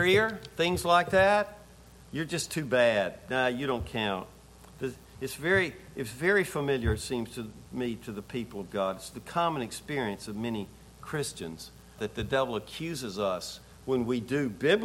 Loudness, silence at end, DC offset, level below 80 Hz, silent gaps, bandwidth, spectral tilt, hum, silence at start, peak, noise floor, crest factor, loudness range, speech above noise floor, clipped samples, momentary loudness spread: -30 LUFS; 0 s; under 0.1%; -50 dBFS; none; 16.5 kHz; -4.5 dB/octave; none; 0 s; -10 dBFS; -53 dBFS; 20 dB; 7 LU; 23 dB; under 0.1%; 15 LU